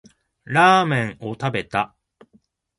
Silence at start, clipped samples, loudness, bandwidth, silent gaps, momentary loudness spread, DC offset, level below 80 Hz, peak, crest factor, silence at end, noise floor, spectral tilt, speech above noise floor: 0.5 s; under 0.1%; -20 LUFS; 11.5 kHz; none; 13 LU; under 0.1%; -58 dBFS; -2 dBFS; 20 dB; 0.95 s; -60 dBFS; -5.5 dB/octave; 41 dB